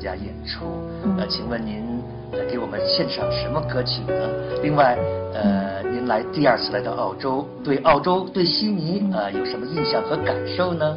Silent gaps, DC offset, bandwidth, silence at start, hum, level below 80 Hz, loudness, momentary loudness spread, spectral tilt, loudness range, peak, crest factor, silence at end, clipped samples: none; under 0.1%; 6 kHz; 0 s; none; -44 dBFS; -23 LUFS; 10 LU; -8.5 dB/octave; 3 LU; -2 dBFS; 20 dB; 0 s; under 0.1%